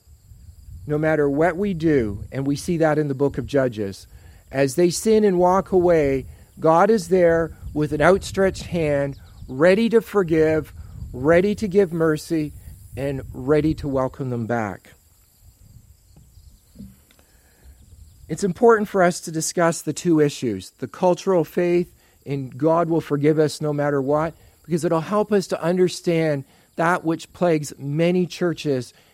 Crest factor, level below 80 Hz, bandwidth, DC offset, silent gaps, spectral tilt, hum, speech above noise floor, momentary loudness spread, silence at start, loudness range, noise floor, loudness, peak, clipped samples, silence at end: 20 dB; -46 dBFS; 16 kHz; under 0.1%; none; -6 dB/octave; none; 35 dB; 12 LU; 0.7 s; 7 LU; -55 dBFS; -21 LUFS; 0 dBFS; under 0.1%; 0.25 s